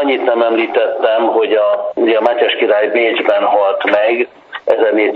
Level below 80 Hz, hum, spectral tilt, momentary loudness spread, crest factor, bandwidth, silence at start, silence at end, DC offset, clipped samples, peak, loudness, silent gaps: -66 dBFS; none; -5.5 dB/octave; 3 LU; 12 dB; 5.4 kHz; 0 s; 0 s; under 0.1%; under 0.1%; 0 dBFS; -13 LUFS; none